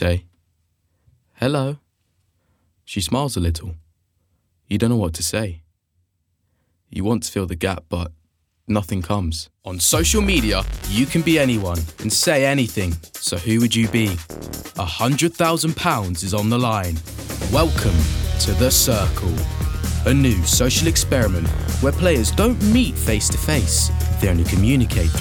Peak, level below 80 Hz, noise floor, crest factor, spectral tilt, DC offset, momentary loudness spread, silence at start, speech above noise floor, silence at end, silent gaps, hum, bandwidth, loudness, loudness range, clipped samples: -2 dBFS; -30 dBFS; -69 dBFS; 18 dB; -4.5 dB/octave; under 0.1%; 11 LU; 0 s; 50 dB; 0 s; none; none; over 20 kHz; -19 LUFS; 8 LU; under 0.1%